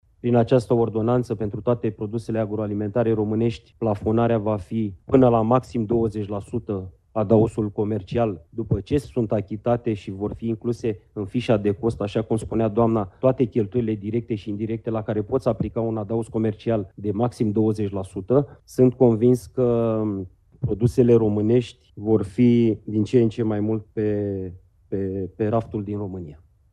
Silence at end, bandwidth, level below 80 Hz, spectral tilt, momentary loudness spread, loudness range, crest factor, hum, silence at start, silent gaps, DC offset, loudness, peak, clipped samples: 0.35 s; 12 kHz; -48 dBFS; -9 dB/octave; 10 LU; 5 LU; 20 dB; none; 0.25 s; none; under 0.1%; -23 LUFS; -2 dBFS; under 0.1%